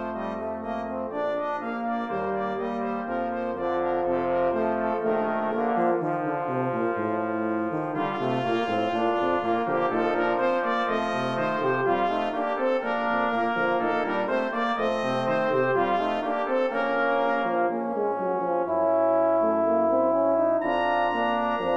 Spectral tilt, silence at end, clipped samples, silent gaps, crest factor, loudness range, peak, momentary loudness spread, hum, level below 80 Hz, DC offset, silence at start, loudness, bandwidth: -7 dB/octave; 0 s; under 0.1%; none; 14 dB; 3 LU; -10 dBFS; 6 LU; none; -64 dBFS; 0.2%; 0 s; -25 LUFS; 8 kHz